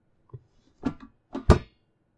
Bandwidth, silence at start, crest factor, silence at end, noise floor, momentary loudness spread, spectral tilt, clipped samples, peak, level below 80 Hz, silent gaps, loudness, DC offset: 11 kHz; 0.85 s; 28 dB; 0.55 s; -67 dBFS; 18 LU; -7.5 dB/octave; under 0.1%; 0 dBFS; -34 dBFS; none; -26 LUFS; under 0.1%